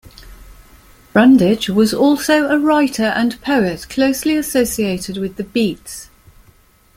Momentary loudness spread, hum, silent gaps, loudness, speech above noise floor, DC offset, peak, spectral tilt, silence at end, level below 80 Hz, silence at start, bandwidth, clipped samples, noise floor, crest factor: 11 LU; none; none; -15 LUFS; 36 dB; under 0.1%; -2 dBFS; -4.5 dB/octave; 0.9 s; -44 dBFS; 0.2 s; 16.5 kHz; under 0.1%; -51 dBFS; 16 dB